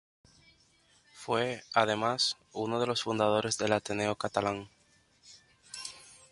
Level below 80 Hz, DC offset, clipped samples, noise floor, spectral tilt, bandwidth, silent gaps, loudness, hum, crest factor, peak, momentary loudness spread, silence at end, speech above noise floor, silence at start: -68 dBFS; under 0.1%; under 0.1%; -67 dBFS; -3.5 dB/octave; 11.5 kHz; none; -31 LUFS; none; 24 dB; -10 dBFS; 15 LU; 0.2 s; 36 dB; 1.15 s